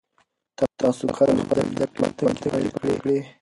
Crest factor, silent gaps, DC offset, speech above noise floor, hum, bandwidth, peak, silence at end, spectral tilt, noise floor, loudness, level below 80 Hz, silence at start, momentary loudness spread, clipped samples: 18 dB; none; under 0.1%; 45 dB; none; 11.5 kHz; -6 dBFS; 0.1 s; -6.5 dB/octave; -67 dBFS; -23 LUFS; -52 dBFS; 0.6 s; 5 LU; under 0.1%